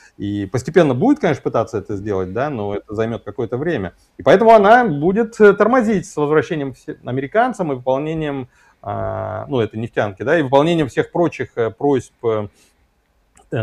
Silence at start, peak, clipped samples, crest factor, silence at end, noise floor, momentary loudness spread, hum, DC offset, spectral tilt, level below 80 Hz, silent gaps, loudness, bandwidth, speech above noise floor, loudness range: 0.2 s; 0 dBFS; under 0.1%; 18 dB; 0 s; -61 dBFS; 13 LU; none; under 0.1%; -7 dB/octave; -50 dBFS; none; -17 LUFS; 11.5 kHz; 44 dB; 7 LU